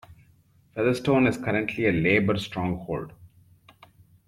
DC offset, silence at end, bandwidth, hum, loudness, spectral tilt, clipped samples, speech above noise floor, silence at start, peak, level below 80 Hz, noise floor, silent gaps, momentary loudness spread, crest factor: under 0.1%; 1 s; 14.5 kHz; none; -25 LUFS; -7 dB/octave; under 0.1%; 36 dB; 0.1 s; -8 dBFS; -54 dBFS; -60 dBFS; none; 12 LU; 20 dB